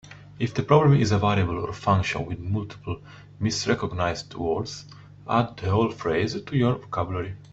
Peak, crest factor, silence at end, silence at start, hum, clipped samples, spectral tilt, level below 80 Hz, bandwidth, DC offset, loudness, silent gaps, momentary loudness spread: -4 dBFS; 20 dB; 0.05 s; 0.05 s; none; under 0.1%; -6.5 dB/octave; -50 dBFS; 8 kHz; under 0.1%; -25 LUFS; none; 13 LU